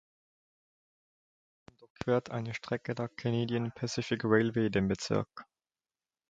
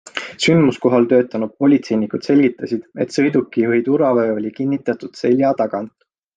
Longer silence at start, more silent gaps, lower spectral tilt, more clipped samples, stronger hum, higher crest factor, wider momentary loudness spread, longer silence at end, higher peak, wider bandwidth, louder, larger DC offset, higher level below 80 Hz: first, 1.8 s vs 0.15 s; first, 1.90-1.95 s vs none; about the same, -6 dB/octave vs -6.5 dB/octave; neither; neither; first, 22 dB vs 14 dB; about the same, 10 LU vs 9 LU; first, 0.85 s vs 0.5 s; second, -12 dBFS vs -2 dBFS; about the same, 9.2 kHz vs 9.2 kHz; second, -32 LUFS vs -17 LUFS; neither; about the same, -62 dBFS vs -62 dBFS